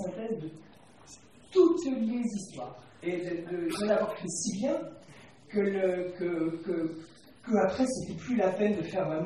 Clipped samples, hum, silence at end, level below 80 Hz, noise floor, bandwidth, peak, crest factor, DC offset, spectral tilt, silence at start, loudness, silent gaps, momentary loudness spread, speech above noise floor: under 0.1%; none; 0 s; -66 dBFS; -55 dBFS; 13 kHz; -12 dBFS; 18 dB; under 0.1%; -5.5 dB/octave; 0 s; -30 LUFS; none; 13 LU; 24 dB